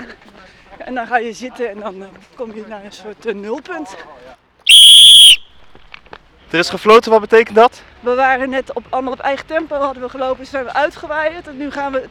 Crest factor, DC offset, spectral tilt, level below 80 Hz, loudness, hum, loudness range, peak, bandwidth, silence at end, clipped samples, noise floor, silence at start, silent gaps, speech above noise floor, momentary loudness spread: 14 dB; under 0.1%; -0.5 dB/octave; -50 dBFS; -9 LUFS; none; 19 LU; 0 dBFS; over 20 kHz; 0.05 s; 0.2%; -43 dBFS; 0 s; none; 26 dB; 26 LU